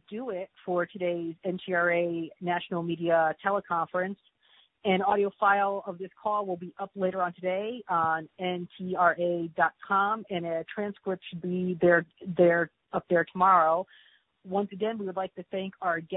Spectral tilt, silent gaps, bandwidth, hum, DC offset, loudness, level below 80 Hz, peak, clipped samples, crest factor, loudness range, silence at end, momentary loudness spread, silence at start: -10 dB/octave; none; 4 kHz; none; under 0.1%; -28 LUFS; -72 dBFS; -8 dBFS; under 0.1%; 20 dB; 4 LU; 0 s; 12 LU; 0.1 s